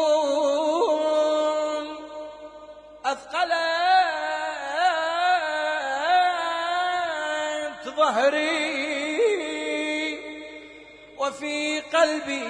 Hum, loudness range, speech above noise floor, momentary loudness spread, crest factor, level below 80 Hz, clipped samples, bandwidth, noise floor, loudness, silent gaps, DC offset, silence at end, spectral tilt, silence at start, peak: 50 Hz at -65 dBFS; 3 LU; 24 dB; 15 LU; 16 dB; -66 dBFS; under 0.1%; 10 kHz; -46 dBFS; -24 LUFS; none; under 0.1%; 0 s; -1.5 dB/octave; 0 s; -8 dBFS